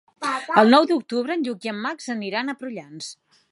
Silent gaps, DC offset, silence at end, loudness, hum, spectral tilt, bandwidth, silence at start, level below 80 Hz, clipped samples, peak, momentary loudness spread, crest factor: none; under 0.1%; 0.4 s; -21 LUFS; none; -4.5 dB/octave; 11.5 kHz; 0.2 s; -76 dBFS; under 0.1%; -2 dBFS; 19 LU; 22 dB